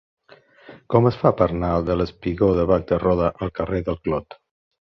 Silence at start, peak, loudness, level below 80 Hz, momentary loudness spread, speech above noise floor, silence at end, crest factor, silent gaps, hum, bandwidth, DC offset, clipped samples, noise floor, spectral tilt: 0.7 s; -2 dBFS; -21 LUFS; -38 dBFS; 7 LU; 31 dB; 0.55 s; 20 dB; none; none; 6.2 kHz; under 0.1%; under 0.1%; -51 dBFS; -10 dB/octave